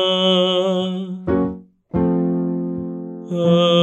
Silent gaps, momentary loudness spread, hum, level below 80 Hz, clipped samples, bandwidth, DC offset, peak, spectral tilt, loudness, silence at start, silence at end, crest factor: none; 12 LU; none; -46 dBFS; under 0.1%; 8.2 kHz; under 0.1%; -4 dBFS; -7 dB/octave; -19 LUFS; 0 s; 0 s; 14 dB